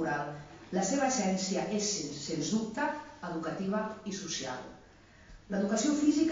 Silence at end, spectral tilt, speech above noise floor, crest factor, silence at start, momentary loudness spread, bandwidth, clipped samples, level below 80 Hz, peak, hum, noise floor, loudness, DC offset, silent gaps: 0 s; -4.5 dB/octave; 25 dB; 18 dB; 0 s; 11 LU; 7.6 kHz; under 0.1%; -62 dBFS; -16 dBFS; none; -57 dBFS; -33 LUFS; under 0.1%; none